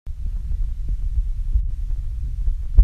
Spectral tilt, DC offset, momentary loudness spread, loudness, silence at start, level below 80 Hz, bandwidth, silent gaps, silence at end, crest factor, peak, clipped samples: -8.5 dB/octave; under 0.1%; 4 LU; -28 LUFS; 0.05 s; -22 dBFS; 1.2 kHz; none; 0 s; 20 dB; 0 dBFS; under 0.1%